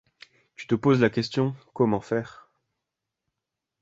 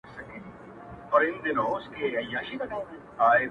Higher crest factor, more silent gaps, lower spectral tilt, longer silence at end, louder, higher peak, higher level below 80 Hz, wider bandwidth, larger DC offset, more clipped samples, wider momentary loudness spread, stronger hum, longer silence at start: about the same, 20 dB vs 20 dB; neither; about the same, -7.5 dB/octave vs -6.5 dB/octave; first, 1.5 s vs 0 s; about the same, -25 LUFS vs -27 LUFS; first, -6 dBFS vs -10 dBFS; about the same, -62 dBFS vs -60 dBFS; first, 8 kHz vs 6.4 kHz; neither; neither; second, 10 LU vs 21 LU; neither; first, 0.6 s vs 0.05 s